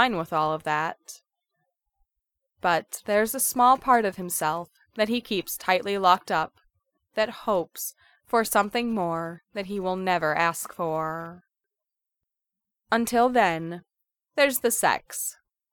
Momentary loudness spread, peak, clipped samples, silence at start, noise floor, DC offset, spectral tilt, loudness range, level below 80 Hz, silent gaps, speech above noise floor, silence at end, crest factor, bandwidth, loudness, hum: 13 LU; -6 dBFS; under 0.1%; 0 s; -87 dBFS; under 0.1%; -3 dB/octave; 5 LU; -62 dBFS; none; 62 dB; 0.4 s; 22 dB; 20 kHz; -25 LUFS; none